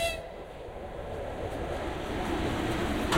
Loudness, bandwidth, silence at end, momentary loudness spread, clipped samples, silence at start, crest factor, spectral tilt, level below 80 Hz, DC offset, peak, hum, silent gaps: -34 LUFS; 16 kHz; 0 s; 11 LU; under 0.1%; 0 s; 18 dB; -5 dB/octave; -42 dBFS; under 0.1%; -14 dBFS; none; none